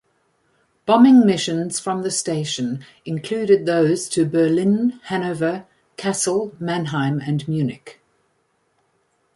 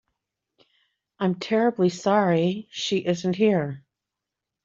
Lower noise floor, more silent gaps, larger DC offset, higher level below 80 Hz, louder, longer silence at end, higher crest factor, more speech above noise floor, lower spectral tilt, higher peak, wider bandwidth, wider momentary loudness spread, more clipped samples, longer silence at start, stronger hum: second, -67 dBFS vs -86 dBFS; neither; neither; first, -62 dBFS vs -68 dBFS; first, -19 LUFS vs -24 LUFS; first, 1.45 s vs 0.85 s; about the same, 18 dB vs 18 dB; second, 48 dB vs 63 dB; about the same, -5.5 dB/octave vs -6 dB/octave; first, -2 dBFS vs -8 dBFS; first, 11.5 kHz vs 7.8 kHz; first, 13 LU vs 8 LU; neither; second, 0.85 s vs 1.2 s; neither